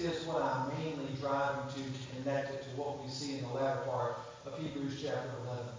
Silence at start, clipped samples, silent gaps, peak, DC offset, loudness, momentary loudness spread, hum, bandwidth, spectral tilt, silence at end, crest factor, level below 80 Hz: 0 s; under 0.1%; none; -22 dBFS; under 0.1%; -38 LUFS; 7 LU; none; 7.6 kHz; -5.5 dB/octave; 0 s; 16 dB; -66 dBFS